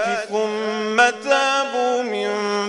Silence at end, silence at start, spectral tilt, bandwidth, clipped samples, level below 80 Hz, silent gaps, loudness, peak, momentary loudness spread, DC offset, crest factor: 0 s; 0 s; -2.5 dB/octave; 11 kHz; under 0.1%; -72 dBFS; none; -20 LUFS; 0 dBFS; 6 LU; under 0.1%; 20 dB